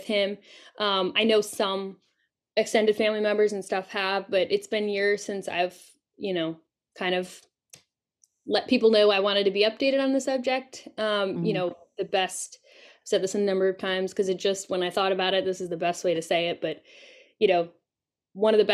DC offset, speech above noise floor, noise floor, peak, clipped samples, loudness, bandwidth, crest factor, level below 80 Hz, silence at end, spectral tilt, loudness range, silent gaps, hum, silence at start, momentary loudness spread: under 0.1%; 65 dB; -90 dBFS; -8 dBFS; under 0.1%; -26 LUFS; 13.5 kHz; 18 dB; -76 dBFS; 0 s; -4 dB/octave; 5 LU; none; none; 0 s; 11 LU